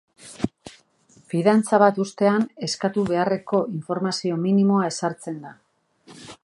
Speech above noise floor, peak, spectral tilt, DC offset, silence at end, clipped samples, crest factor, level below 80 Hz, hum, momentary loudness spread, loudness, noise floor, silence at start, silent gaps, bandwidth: 35 dB; -2 dBFS; -6 dB/octave; under 0.1%; 0.1 s; under 0.1%; 20 dB; -60 dBFS; none; 13 LU; -22 LUFS; -57 dBFS; 0.25 s; none; 11.5 kHz